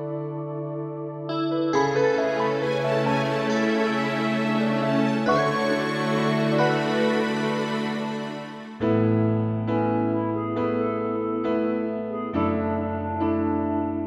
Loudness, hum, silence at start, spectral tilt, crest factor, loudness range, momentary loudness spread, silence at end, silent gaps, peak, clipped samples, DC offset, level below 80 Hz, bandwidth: -24 LUFS; none; 0 s; -6.5 dB/octave; 14 dB; 3 LU; 9 LU; 0 s; none; -10 dBFS; under 0.1%; under 0.1%; -58 dBFS; 12 kHz